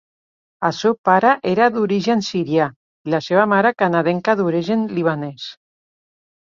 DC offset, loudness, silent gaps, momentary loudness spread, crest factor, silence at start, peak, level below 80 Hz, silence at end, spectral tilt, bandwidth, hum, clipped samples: under 0.1%; -18 LUFS; 0.98-1.04 s, 2.76-3.05 s; 9 LU; 18 dB; 0.6 s; -2 dBFS; -62 dBFS; 1 s; -6 dB/octave; 7.4 kHz; none; under 0.1%